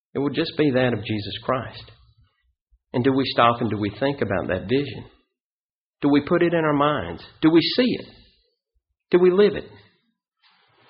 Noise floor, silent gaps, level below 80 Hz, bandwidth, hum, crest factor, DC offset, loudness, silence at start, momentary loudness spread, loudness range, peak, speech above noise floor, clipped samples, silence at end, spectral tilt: under -90 dBFS; 2.61-2.67 s, 5.41-5.93 s; -54 dBFS; 5.2 kHz; none; 18 dB; under 0.1%; -21 LUFS; 0.15 s; 11 LU; 3 LU; -4 dBFS; over 69 dB; under 0.1%; 1.2 s; -4.5 dB/octave